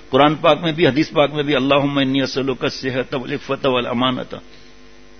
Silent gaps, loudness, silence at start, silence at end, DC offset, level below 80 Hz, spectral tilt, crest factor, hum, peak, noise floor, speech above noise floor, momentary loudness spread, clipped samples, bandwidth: none; -18 LUFS; 0.1 s; 0.8 s; 0.8%; -48 dBFS; -6 dB/octave; 18 dB; none; 0 dBFS; -46 dBFS; 28 dB; 9 LU; under 0.1%; 6.6 kHz